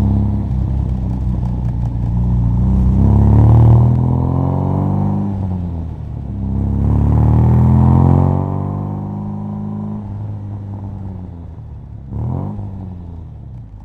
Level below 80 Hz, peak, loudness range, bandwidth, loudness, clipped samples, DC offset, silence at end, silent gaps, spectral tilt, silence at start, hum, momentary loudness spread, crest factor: -22 dBFS; 0 dBFS; 13 LU; 3.1 kHz; -15 LUFS; under 0.1%; under 0.1%; 0 s; none; -11.5 dB/octave; 0 s; none; 19 LU; 14 dB